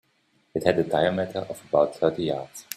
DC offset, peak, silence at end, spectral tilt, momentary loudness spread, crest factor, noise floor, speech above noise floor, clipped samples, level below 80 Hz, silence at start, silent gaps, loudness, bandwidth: under 0.1%; -4 dBFS; 0 s; -5.5 dB/octave; 10 LU; 20 dB; -67 dBFS; 42 dB; under 0.1%; -60 dBFS; 0.55 s; none; -25 LUFS; 14.5 kHz